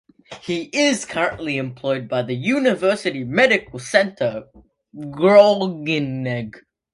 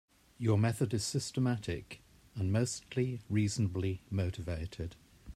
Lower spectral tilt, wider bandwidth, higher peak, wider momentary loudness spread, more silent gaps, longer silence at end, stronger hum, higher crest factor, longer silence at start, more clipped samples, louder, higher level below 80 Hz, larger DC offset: about the same, -5 dB/octave vs -6 dB/octave; second, 11.5 kHz vs 13.5 kHz; first, 0 dBFS vs -18 dBFS; about the same, 13 LU vs 12 LU; neither; first, 0.35 s vs 0.05 s; neither; about the same, 20 dB vs 16 dB; about the same, 0.3 s vs 0.4 s; neither; first, -19 LUFS vs -35 LUFS; about the same, -58 dBFS vs -58 dBFS; neither